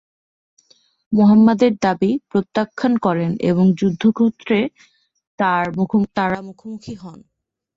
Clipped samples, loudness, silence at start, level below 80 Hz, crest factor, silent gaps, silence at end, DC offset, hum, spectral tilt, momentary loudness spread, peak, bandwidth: under 0.1%; -17 LUFS; 1.1 s; -56 dBFS; 16 dB; 5.27-5.38 s; 0.6 s; under 0.1%; none; -8 dB/octave; 16 LU; -2 dBFS; 7.6 kHz